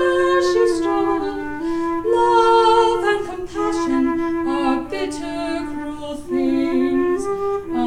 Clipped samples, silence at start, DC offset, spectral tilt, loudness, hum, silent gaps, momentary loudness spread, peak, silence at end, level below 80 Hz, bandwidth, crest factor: under 0.1%; 0 s; under 0.1%; -4.5 dB/octave; -19 LUFS; none; none; 11 LU; -4 dBFS; 0 s; -44 dBFS; 11 kHz; 14 dB